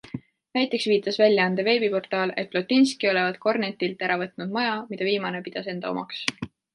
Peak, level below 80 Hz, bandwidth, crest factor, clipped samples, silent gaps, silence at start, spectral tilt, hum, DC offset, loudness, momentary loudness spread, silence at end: -2 dBFS; -68 dBFS; 11.5 kHz; 22 dB; under 0.1%; none; 0.05 s; -5 dB/octave; none; under 0.1%; -24 LUFS; 10 LU; 0.3 s